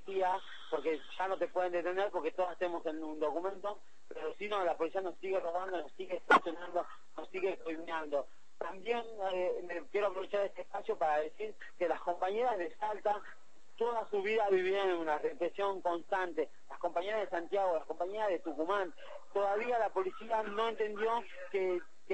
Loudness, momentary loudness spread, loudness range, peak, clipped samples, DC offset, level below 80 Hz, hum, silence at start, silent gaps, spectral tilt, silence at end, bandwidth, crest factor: -36 LUFS; 9 LU; 3 LU; -14 dBFS; under 0.1%; 0.5%; -74 dBFS; none; 0.05 s; none; -4.5 dB/octave; 0 s; 8.4 kHz; 22 dB